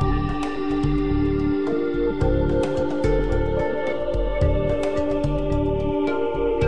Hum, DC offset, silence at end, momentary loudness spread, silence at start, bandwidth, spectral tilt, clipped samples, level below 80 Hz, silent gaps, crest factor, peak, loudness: none; 2%; 0 s; 3 LU; 0 s; 10.5 kHz; -8 dB/octave; under 0.1%; -28 dBFS; none; 14 dB; -8 dBFS; -23 LUFS